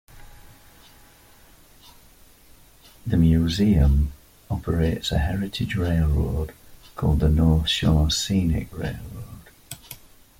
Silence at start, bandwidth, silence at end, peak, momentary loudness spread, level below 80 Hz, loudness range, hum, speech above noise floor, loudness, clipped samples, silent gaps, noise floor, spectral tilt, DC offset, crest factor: 0.15 s; 16.5 kHz; 0.45 s; -6 dBFS; 20 LU; -30 dBFS; 3 LU; none; 31 dB; -22 LUFS; under 0.1%; none; -51 dBFS; -6 dB/octave; under 0.1%; 16 dB